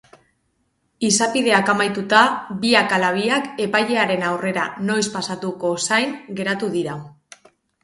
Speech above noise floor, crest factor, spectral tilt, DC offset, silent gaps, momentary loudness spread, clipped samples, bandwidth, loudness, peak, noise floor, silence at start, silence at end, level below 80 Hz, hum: 49 dB; 20 dB; -3 dB/octave; under 0.1%; none; 10 LU; under 0.1%; 11.5 kHz; -19 LUFS; 0 dBFS; -68 dBFS; 1 s; 0.75 s; -64 dBFS; none